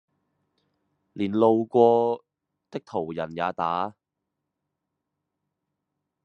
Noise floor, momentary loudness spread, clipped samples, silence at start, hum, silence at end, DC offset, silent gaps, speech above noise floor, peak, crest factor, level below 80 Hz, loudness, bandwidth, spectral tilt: -83 dBFS; 15 LU; under 0.1%; 1.15 s; none; 2.35 s; under 0.1%; none; 60 dB; -6 dBFS; 22 dB; -74 dBFS; -24 LUFS; 6.8 kHz; -8 dB/octave